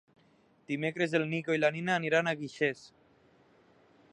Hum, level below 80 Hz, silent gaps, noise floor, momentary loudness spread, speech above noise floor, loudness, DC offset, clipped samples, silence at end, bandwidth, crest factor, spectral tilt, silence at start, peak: none; -78 dBFS; none; -66 dBFS; 6 LU; 35 dB; -31 LUFS; under 0.1%; under 0.1%; 1.25 s; 10.5 kHz; 20 dB; -5.5 dB/octave; 0.7 s; -14 dBFS